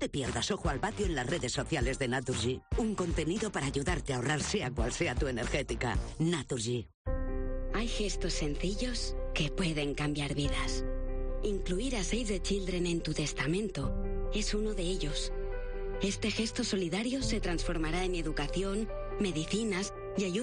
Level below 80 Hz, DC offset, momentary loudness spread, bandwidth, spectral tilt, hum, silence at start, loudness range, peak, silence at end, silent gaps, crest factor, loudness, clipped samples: -38 dBFS; under 0.1%; 5 LU; 10 kHz; -4.5 dB/octave; none; 0 s; 2 LU; -18 dBFS; 0 s; 6.94-7.05 s; 14 dB; -34 LUFS; under 0.1%